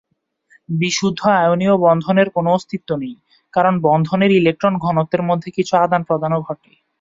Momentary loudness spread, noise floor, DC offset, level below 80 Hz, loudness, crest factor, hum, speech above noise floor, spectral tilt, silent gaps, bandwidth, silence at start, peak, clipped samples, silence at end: 10 LU; -59 dBFS; under 0.1%; -58 dBFS; -17 LUFS; 16 dB; none; 42 dB; -6 dB/octave; none; 7.8 kHz; 0.7 s; -2 dBFS; under 0.1%; 0.45 s